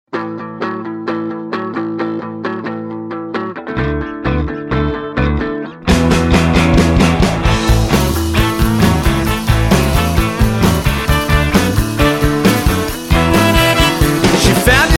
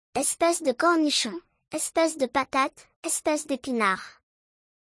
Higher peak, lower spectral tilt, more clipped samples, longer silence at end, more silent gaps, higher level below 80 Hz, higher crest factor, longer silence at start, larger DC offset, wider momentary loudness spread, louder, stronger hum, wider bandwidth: first, 0 dBFS vs -10 dBFS; first, -5.5 dB/octave vs -2 dB/octave; neither; second, 0 s vs 0.9 s; second, none vs 2.96-3.03 s; first, -20 dBFS vs -66 dBFS; second, 12 dB vs 18 dB; about the same, 0.15 s vs 0.15 s; neither; about the same, 11 LU vs 10 LU; first, -14 LUFS vs -25 LUFS; neither; first, 17 kHz vs 12 kHz